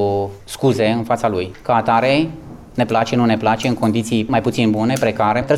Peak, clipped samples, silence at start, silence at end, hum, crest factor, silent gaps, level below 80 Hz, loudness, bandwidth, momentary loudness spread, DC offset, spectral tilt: -4 dBFS; under 0.1%; 0 s; 0 s; none; 12 dB; none; -46 dBFS; -17 LUFS; 16 kHz; 7 LU; under 0.1%; -6 dB/octave